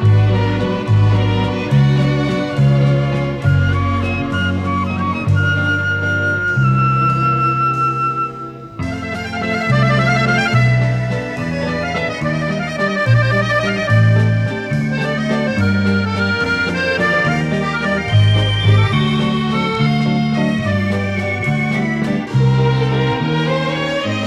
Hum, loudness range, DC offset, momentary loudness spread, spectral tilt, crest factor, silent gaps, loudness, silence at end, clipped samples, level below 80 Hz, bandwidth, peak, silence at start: none; 2 LU; under 0.1%; 6 LU; -7 dB/octave; 14 dB; none; -16 LUFS; 0 s; under 0.1%; -38 dBFS; 9.8 kHz; -2 dBFS; 0 s